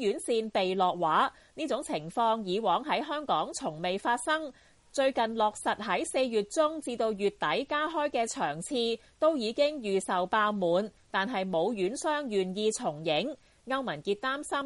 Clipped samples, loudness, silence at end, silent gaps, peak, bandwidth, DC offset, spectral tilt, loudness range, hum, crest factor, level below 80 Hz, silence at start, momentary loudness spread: under 0.1%; -30 LUFS; 0 s; none; -14 dBFS; 11.5 kHz; under 0.1%; -4 dB/octave; 1 LU; none; 16 dB; -66 dBFS; 0 s; 5 LU